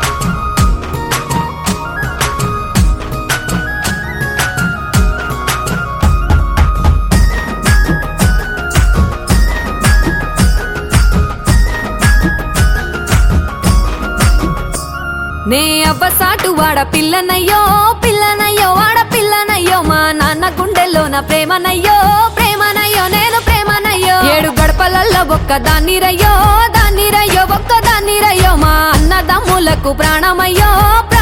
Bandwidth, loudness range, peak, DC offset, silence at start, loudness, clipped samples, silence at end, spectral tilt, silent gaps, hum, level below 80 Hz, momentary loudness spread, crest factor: 17.5 kHz; 5 LU; 0 dBFS; under 0.1%; 0 s; -11 LUFS; under 0.1%; 0 s; -4 dB/octave; none; none; -16 dBFS; 7 LU; 10 dB